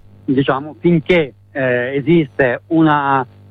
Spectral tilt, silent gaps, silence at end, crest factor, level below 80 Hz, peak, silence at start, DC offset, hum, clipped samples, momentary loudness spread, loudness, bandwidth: -9 dB/octave; none; 0.25 s; 14 dB; -48 dBFS; -2 dBFS; 0.3 s; under 0.1%; none; under 0.1%; 6 LU; -16 LUFS; 4.8 kHz